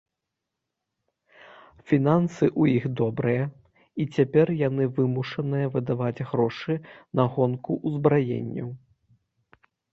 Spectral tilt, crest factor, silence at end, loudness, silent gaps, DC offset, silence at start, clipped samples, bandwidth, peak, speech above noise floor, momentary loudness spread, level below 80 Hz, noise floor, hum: -9 dB/octave; 20 dB; 1.15 s; -25 LUFS; none; under 0.1%; 1.85 s; under 0.1%; 7.4 kHz; -4 dBFS; 60 dB; 10 LU; -62 dBFS; -84 dBFS; none